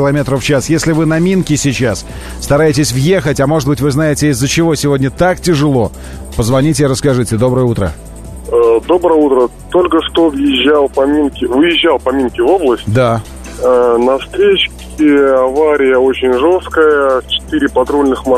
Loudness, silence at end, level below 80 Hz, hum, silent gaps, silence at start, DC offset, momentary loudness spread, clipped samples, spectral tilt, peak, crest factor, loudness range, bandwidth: -11 LUFS; 0 s; -32 dBFS; none; none; 0 s; under 0.1%; 6 LU; under 0.1%; -5.5 dB/octave; 0 dBFS; 10 dB; 2 LU; 13.5 kHz